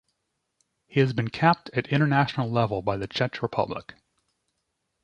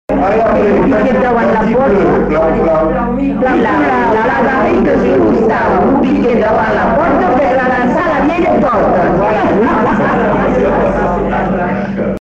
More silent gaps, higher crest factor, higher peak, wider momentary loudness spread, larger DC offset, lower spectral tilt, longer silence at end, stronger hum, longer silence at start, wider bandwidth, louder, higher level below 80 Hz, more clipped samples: neither; first, 22 dB vs 8 dB; second, -6 dBFS vs -2 dBFS; first, 7 LU vs 3 LU; neither; about the same, -7.5 dB/octave vs -8 dB/octave; first, 1.1 s vs 0.05 s; neither; first, 0.9 s vs 0.1 s; about the same, 8.2 kHz vs 8 kHz; second, -25 LUFS vs -11 LUFS; second, -58 dBFS vs -30 dBFS; neither